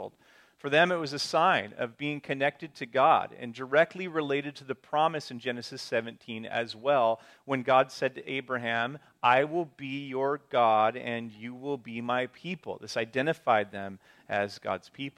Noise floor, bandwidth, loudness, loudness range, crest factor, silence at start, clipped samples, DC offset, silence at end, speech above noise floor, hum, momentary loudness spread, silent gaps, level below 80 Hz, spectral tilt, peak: -61 dBFS; 13.5 kHz; -29 LUFS; 4 LU; 20 dB; 0 s; under 0.1%; under 0.1%; 0.05 s; 32 dB; none; 13 LU; none; -78 dBFS; -5 dB/octave; -8 dBFS